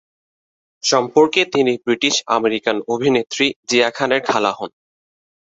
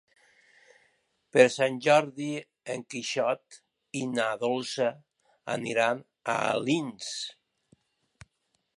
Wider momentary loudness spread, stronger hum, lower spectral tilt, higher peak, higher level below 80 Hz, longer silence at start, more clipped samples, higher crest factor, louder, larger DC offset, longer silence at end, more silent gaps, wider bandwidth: second, 6 LU vs 14 LU; neither; about the same, -3 dB/octave vs -4 dB/octave; first, 0 dBFS vs -4 dBFS; first, -62 dBFS vs -76 dBFS; second, 0.85 s vs 1.35 s; neither; second, 18 dB vs 26 dB; first, -17 LUFS vs -28 LUFS; neither; second, 0.9 s vs 1.45 s; first, 3.56-3.63 s vs none; second, 8.2 kHz vs 11.5 kHz